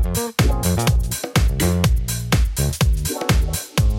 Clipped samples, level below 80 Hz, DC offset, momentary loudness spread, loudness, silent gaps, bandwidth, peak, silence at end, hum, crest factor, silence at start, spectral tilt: under 0.1%; -22 dBFS; under 0.1%; 3 LU; -20 LUFS; none; 17 kHz; -4 dBFS; 0 s; none; 14 dB; 0 s; -4.5 dB/octave